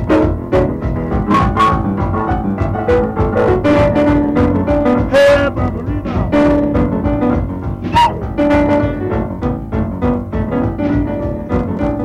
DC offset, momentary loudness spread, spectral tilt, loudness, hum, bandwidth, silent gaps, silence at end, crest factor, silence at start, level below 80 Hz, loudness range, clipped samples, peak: under 0.1%; 7 LU; -8 dB/octave; -15 LUFS; none; 11.5 kHz; none; 0 s; 10 dB; 0 s; -26 dBFS; 4 LU; under 0.1%; -4 dBFS